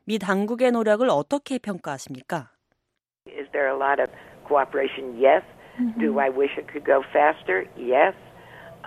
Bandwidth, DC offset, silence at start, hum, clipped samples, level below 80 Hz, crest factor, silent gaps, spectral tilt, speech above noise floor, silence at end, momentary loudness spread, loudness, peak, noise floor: 14.5 kHz; under 0.1%; 0.05 s; none; under 0.1%; -64 dBFS; 20 dB; none; -5.5 dB/octave; 58 dB; 0 s; 12 LU; -23 LUFS; -4 dBFS; -81 dBFS